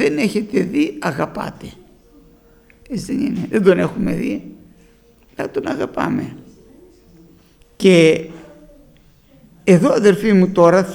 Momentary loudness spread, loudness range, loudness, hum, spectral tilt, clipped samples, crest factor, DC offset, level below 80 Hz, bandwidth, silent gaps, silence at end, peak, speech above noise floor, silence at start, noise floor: 17 LU; 9 LU; -16 LUFS; none; -6.5 dB/octave; under 0.1%; 18 dB; under 0.1%; -48 dBFS; 19 kHz; none; 0 s; 0 dBFS; 35 dB; 0 s; -51 dBFS